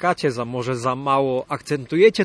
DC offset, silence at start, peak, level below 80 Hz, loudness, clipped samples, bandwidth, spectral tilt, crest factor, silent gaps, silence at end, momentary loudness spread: under 0.1%; 0 s; -2 dBFS; -58 dBFS; -21 LUFS; under 0.1%; 11 kHz; -6 dB/octave; 18 dB; none; 0 s; 9 LU